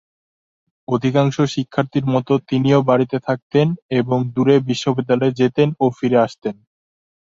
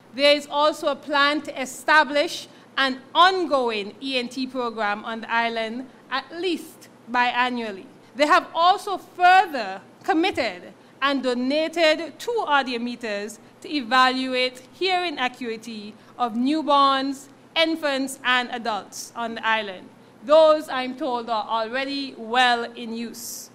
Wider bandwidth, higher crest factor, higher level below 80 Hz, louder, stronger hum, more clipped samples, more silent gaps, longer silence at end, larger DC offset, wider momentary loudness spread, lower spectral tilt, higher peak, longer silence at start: second, 7.6 kHz vs 16 kHz; about the same, 16 dB vs 20 dB; first, -56 dBFS vs -70 dBFS; first, -18 LUFS vs -22 LUFS; neither; neither; first, 3.42-3.50 s, 3.82-3.89 s vs none; first, 0.85 s vs 0.1 s; neither; second, 6 LU vs 14 LU; first, -7.5 dB/octave vs -2.5 dB/octave; about the same, -2 dBFS vs -4 dBFS; first, 0.9 s vs 0.15 s